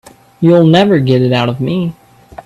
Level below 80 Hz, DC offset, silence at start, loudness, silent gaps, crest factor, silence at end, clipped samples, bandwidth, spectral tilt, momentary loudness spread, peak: -48 dBFS; under 0.1%; 0.4 s; -11 LUFS; none; 12 dB; 0.55 s; under 0.1%; 12.5 kHz; -8 dB/octave; 9 LU; 0 dBFS